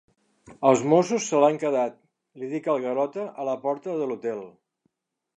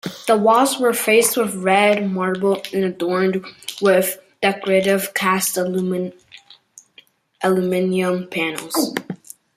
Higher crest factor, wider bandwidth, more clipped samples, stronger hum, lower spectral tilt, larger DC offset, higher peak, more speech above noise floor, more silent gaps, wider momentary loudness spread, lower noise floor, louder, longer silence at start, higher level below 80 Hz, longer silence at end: about the same, 22 dB vs 18 dB; second, 10 kHz vs 16 kHz; neither; neither; first, -5.5 dB/octave vs -4 dB/octave; neither; about the same, -4 dBFS vs -2 dBFS; first, 54 dB vs 34 dB; neither; about the same, 11 LU vs 9 LU; first, -78 dBFS vs -52 dBFS; second, -25 LUFS vs -18 LUFS; first, 0.5 s vs 0.05 s; second, -74 dBFS vs -66 dBFS; first, 0.85 s vs 0.4 s